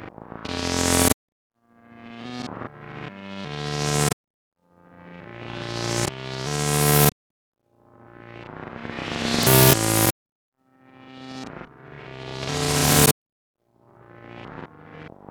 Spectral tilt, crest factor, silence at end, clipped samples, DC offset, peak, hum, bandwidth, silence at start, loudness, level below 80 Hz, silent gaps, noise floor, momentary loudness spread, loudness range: -3.5 dB/octave; 22 dB; 0.25 s; under 0.1%; under 0.1%; -4 dBFS; none; over 20 kHz; 0 s; -21 LUFS; -46 dBFS; 1.13-1.50 s, 4.13-4.24 s, 4.30-4.52 s, 7.12-7.52 s, 10.11-10.26 s, 10.32-10.52 s, 13.11-13.54 s; -54 dBFS; 25 LU; 8 LU